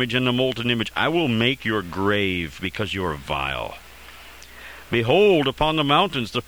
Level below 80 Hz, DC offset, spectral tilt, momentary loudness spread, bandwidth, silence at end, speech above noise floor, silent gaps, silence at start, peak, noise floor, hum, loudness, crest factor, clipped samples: -44 dBFS; 0.3%; -5.5 dB/octave; 22 LU; over 20 kHz; 0.05 s; 22 dB; none; 0 s; -4 dBFS; -43 dBFS; none; -21 LUFS; 18 dB; under 0.1%